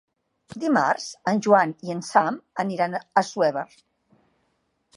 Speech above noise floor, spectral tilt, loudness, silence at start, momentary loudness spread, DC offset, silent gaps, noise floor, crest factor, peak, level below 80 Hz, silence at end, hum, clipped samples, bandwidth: 49 dB; -5 dB/octave; -23 LUFS; 0.5 s; 12 LU; under 0.1%; none; -71 dBFS; 20 dB; -4 dBFS; -74 dBFS; 1.3 s; none; under 0.1%; 11.5 kHz